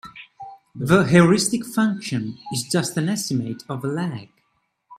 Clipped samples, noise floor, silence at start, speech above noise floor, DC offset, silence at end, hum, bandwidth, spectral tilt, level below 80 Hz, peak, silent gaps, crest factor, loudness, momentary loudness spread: under 0.1%; -70 dBFS; 0.05 s; 49 dB; under 0.1%; 0.05 s; none; 14.5 kHz; -5 dB/octave; -56 dBFS; -2 dBFS; none; 20 dB; -21 LUFS; 24 LU